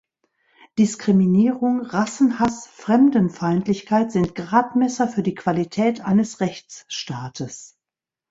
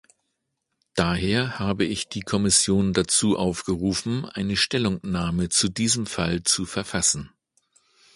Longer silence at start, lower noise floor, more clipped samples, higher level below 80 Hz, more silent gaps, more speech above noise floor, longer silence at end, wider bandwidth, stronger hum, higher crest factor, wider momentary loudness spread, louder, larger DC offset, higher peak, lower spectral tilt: second, 0.75 s vs 0.95 s; first, -89 dBFS vs -78 dBFS; neither; second, -56 dBFS vs -46 dBFS; neither; first, 69 dB vs 55 dB; second, 0.65 s vs 0.9 s; second, 8 kHz vs 11.5 kHz; neither; about the same, 18 dB vs 20 dB; first, 14 LU vs 7 LU; first, -20 LUFS vs -23 LUFS; neither; about the same, -2 dBFS vs -4 dBFS; first, -6.5 dB/octave vs -3.5 dB/octave